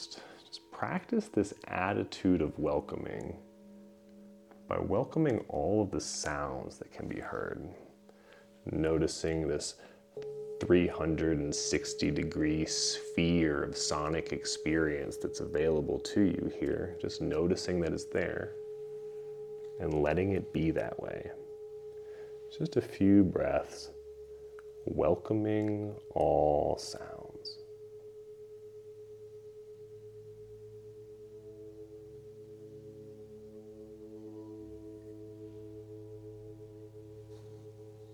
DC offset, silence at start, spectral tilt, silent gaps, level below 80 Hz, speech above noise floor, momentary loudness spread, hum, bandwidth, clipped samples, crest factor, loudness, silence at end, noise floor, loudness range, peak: under 0.1%; 0 s; -5 dB/octave; none; -54 dBFS; 26 dB; 21 LU; none; 13 kHz; under 0.1%; 22 dB; -33 LUFS; 0 s; -58 dBFS; 19 LU; -12 dBFS